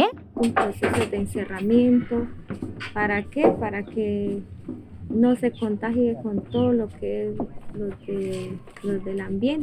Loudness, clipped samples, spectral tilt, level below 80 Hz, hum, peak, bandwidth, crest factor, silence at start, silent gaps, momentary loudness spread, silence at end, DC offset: -25 LUFS; under 0.1%; -7 dB/octave; -48 dBFS; none; -6 dBFS; 13.5 kHz; 20 dB; 0 s; none; 13 LU; 0 s; 0.1%